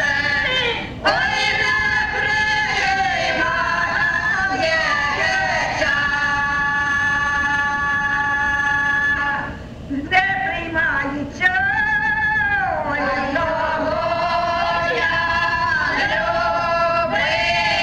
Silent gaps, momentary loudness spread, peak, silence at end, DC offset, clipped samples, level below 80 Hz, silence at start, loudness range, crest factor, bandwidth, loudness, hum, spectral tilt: none; 4 LU; -4 dBFS; 0 s; under 0.1%; under 0.1%; -40 dBFS; 0 s; 1 LU; 16 dB; 11 kHz; -18 LUFS; none; -3.5 dB/octave